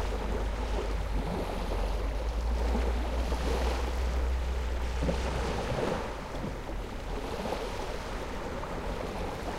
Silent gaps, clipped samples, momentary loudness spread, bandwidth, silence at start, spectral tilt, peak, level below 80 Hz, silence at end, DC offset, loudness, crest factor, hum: none; under 0.1%; 6 LU; 14 kHz; 0 s; -6 dB/octave; -16 dBFS; -34 dBFS; 0 s; 0.1%; -34 LUFS; 16 dB; none